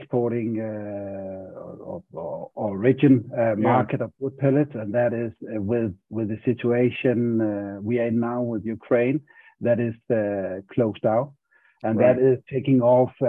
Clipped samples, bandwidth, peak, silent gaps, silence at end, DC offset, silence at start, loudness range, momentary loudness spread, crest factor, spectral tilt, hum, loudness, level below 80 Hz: under 0.1%; 3.8 kHz; -4 dBFS; none; 0 s; under 0.1%; 0 s; 3 LU; 14 LU; 18 dB; -11 dB/octave; none; -23 LUFS; -58 dBFS